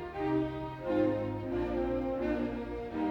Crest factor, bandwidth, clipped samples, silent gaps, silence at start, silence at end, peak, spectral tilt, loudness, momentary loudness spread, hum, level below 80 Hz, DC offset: 14 dB; 6.4 kHz; under 0.1%; none; 0 s; 0 s; -18 dBFS; -9 dB/octave; -34 LUFS; 7 LU; none; -48 dBFS; under 0.1%